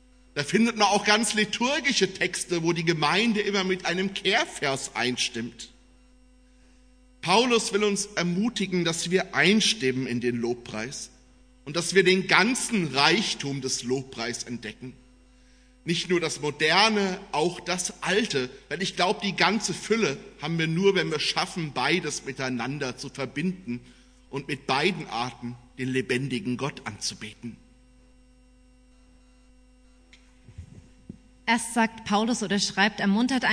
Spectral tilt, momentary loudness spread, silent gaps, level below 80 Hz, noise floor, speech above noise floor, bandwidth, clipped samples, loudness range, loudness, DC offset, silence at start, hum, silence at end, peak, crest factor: -3.5 dB/octave; 14 LU; none; -58 dBFS; -56 dBFS; 31 dB; 11 kHz; under 0.1%; 7 LU; -25 LUFS; under 0.1%; 0.35 s; none; 0 s; -2 dBFS; 24 dB